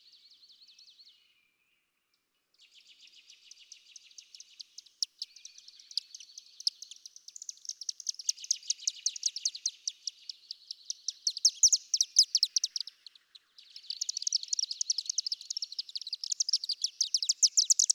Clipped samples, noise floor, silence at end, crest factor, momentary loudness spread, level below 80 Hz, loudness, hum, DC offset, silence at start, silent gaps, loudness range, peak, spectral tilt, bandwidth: under 0.1%; -79 dBFS; 0 s; 24 dB; 25 LU; under -90 dBFS; -29 LUFS; none; under 0.1%; 4.6 s; none; 14 LU; -10 dBFS; 8.5 dB/octave; 18 kHz